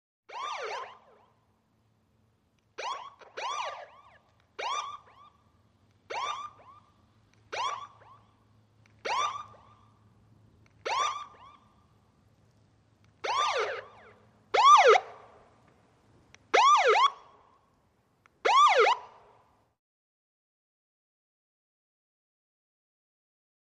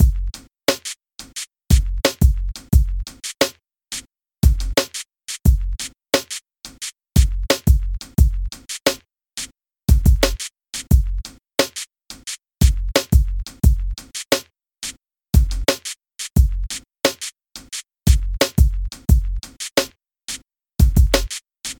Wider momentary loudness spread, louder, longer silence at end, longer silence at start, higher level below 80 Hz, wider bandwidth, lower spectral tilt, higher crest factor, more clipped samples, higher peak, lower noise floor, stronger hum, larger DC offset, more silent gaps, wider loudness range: first, 25 LU vs 14 LU; second, -26 LUFS vs -21 LUFS; first, 4.6 s vs 0.05 s; first, 0.3 s vs 0 s; second, -76 dBFS vs -20 dBFS; second, 11 kHz vs 19 kHz; second, -0.5 dB/octave vs -4.5 dB/octave; first, 24 dB vs 18 dB; neither; second, -8 dBFS vs 0 dBFS; first, -70 dBFS vs -36 dBFS; neither; neither; neither; first, 15 LU vs 2 LU